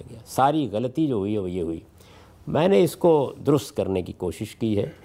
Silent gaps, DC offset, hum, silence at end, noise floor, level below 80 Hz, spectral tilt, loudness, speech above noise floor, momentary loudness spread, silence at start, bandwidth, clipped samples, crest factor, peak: none; under 0.1%; none; 0.1 s; -49 dBFS; -54 dBFS; -7 dB/octave; -24 LUFS; 26 dB; 12 LU; 0 s; 16 kHz; under 0.1%; 16 dB; -8 dBFS